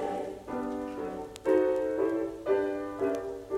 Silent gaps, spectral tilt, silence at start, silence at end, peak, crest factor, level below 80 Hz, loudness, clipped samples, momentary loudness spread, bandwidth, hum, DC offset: none; -6 dB/octave; 0 s; 0 s; -14 dBFS; 18 dB; -58 dBFS; -31 LUFS; under 0.1%; 10 LU; 13.5 kHz; none; under 0.1%